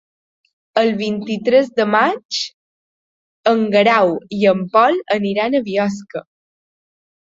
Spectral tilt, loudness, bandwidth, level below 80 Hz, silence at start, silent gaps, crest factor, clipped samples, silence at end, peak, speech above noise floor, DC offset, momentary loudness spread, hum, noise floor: -5 dB/octave; -16 LUFS; 7.8 kHz; -64 dBFS; 0.75 s; 2.25-2.29 s, 2.54-3.44 s; 16 dB; under 0.1%; 1.15 s; -2 dBFS; over 74 dB; under 0.1%; 9 LU; none; under -90 dBFS